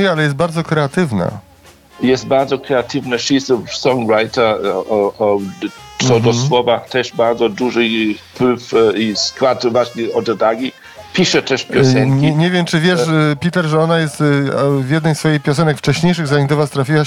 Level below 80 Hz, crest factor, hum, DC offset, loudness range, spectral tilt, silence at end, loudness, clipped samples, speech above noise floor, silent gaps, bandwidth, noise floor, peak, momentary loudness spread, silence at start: -52 dBFS; 14 dB; none; under 0.1%; 3 LU; -5.5 dB/octave; 0 s; -15 LUFS; under 0.1%; 29 dB; none; 14 kHz; -43 dBFS; -2 dBFS; 5 LU; 0 s